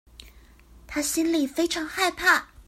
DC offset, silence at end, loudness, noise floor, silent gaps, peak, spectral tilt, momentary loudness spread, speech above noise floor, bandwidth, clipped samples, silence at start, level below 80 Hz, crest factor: under 0.1%; 0.05 s; -24 LUFS; -51 dBFS; none; -6 dBFS; -1.5 dB/octave; 7 LU; 27 dB; 16 kHz; under 0.1%; 0.2 s; -52 dBFS; 20 dB